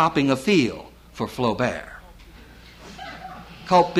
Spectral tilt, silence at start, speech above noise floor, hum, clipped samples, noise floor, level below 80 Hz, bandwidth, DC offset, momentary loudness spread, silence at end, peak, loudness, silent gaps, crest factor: -5.5 dB/octave; 0 s; 25 dB; none; under 0.1%; -46 dBFS; -50 dBFS; 15.5 kHz; under 0.1%; 23 LU; 0 s; -6 dBFS; -22 LUFS; none; 18 dB